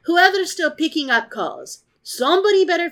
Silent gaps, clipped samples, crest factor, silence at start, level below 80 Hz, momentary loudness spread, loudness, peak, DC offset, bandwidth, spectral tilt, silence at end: none; under 0.1%; 18 dB; 0.05 s; -74 dBFS; 19 LU; -18 LUFS; -2 dBFS; under 0.1%; 17.5 kHz; -1.5 dB/octave; 0 s